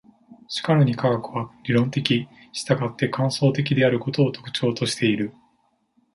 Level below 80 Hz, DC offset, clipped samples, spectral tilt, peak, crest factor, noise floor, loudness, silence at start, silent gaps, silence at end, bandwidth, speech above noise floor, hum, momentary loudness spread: -60 dBFS; under 0.1%; under 0.1%; -6 dB/octave; -2 dBFS; 20 dB; -66 dBFS; -23 LUFS; 0.3 s; none; 0.85 s; 11.5 kHz; 44 dB; none; 11 LU